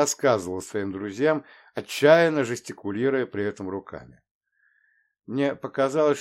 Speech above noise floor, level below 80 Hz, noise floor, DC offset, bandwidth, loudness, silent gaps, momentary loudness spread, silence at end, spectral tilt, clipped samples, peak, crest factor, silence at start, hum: 43 dB; -68 dBFS; -67 dBFS; under 0.1%; 16.5 kHz; -24 LUFS; 4.31-4.41 s; 16 LU; 0 s; -4.5 dB/octave; under 0.1%; -4 dBFS; 20 dB; 0 s; none